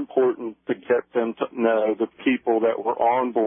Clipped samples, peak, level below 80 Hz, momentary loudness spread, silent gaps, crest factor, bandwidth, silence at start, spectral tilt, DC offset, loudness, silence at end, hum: under 0.1%; -8 dBFS; -72 dBFS; 6 LU; none; 14 dB; 3.7 kHz; 0 s; -10 dB/octave; under 0.1%; -23 LUFS; 0 s; none